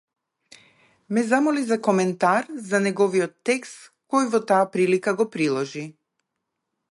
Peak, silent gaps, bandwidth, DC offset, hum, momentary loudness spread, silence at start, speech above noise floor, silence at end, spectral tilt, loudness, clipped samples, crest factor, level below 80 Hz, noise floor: -4 dBFS; none; 11.5 kHz; under 0.1%; none; 7 LU; 1.1 s; 58 dB; 1 s; -5.5 dB/octave; -22 LUFS; under 0.1%; 18 dB; -74 dBFS; -80 dBFS